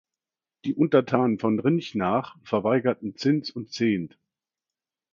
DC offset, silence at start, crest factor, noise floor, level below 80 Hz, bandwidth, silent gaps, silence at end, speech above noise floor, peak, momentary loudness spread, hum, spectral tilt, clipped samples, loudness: under 0.1%; 0.65 s; 22 dB; under -90 dBFS; -64 dBFS; 7.4 kHz; none; 1.05 s; over 66 dB; -4 dBFS; 9 LU; none; -7 dB/octave; under 0.1%; -25 LUFS